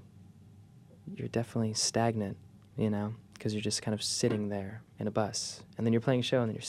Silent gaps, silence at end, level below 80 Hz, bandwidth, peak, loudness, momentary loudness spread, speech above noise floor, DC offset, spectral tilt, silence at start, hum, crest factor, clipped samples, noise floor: none; 0 s; -68 dBFS; 14 kHz; -14 dBFS; -32 LUFS; 12 LU; 24 dB; under 0.1%; -4.5 dB/octave; 0 s; none; 18 dB; under 0.1%; -56 dBFS